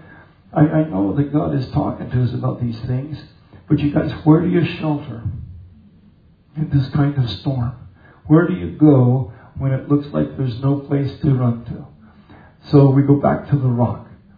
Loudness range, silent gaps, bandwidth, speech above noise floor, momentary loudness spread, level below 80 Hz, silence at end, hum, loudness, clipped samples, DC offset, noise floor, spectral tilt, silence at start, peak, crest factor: 4 LU; none; 5 kHz; 34 dB; 15 LU; -44 dBFS; 0.25 s; none; -18 LUFS; under 0.1%; under 0.1%; -50 dBFS; -11 dB/octave; 0.55 s; 0 dBFS; 18 dB